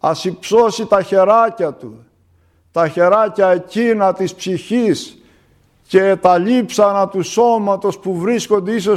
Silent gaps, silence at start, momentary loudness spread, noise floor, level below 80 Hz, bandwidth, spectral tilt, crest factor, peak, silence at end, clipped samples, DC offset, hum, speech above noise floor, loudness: none; 0.05 s; 9 LU; -55 dBFS; -58 dBFS; 14 kHz; -5.5 dB/octave; 14 dB; 0 dBFS; 0 s; under 0.1%; under 0.1%; none; 41 dB; -15 LUFS